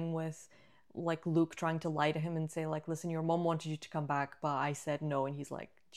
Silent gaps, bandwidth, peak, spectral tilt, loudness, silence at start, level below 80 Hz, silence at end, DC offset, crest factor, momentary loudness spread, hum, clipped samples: none; 13 kHz; -18 dBFS; -6.5 dB/octave; -36 LUFS; 0 s; -78 dBFS; 0 s; under 0.1%; 18 dB; 9 LU; none; under 0.1%